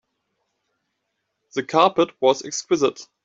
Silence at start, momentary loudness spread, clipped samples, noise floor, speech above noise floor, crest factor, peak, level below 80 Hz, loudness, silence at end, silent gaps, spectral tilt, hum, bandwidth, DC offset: 1.55 s; 9 LU; under 0.1%; -76 dBFS; 56 dB; 20 dB; -4 dBFS; -70 dBFS; -21 LUFS; 0.2 s; none; -3.5 dB/octave; none; 8 kHz; under 0.1%